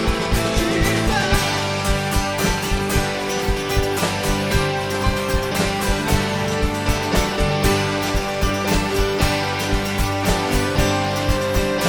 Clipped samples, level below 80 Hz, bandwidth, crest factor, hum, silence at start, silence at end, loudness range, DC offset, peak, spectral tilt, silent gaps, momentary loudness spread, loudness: under 0.1%; -26 dBFS; 19.5 kHz; 16 dB; none; 0 s; 0 s; 1 LU; under 0.1%; -4 dBFS; -4.5 dB/octave; none; 3 LU; -20 LUFS